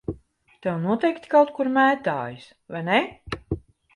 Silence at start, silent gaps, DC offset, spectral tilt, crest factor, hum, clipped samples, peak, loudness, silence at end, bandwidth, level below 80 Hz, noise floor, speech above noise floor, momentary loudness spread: 0.1 s; none; under 0.1%; -7 dB/octave; 18 dB; none; under 0.1%; -6 dBFS; -23 LUFS; 0.35 s; 11 kHz; -50 dBFS; -54 dBFS; 31 dB; 16 LU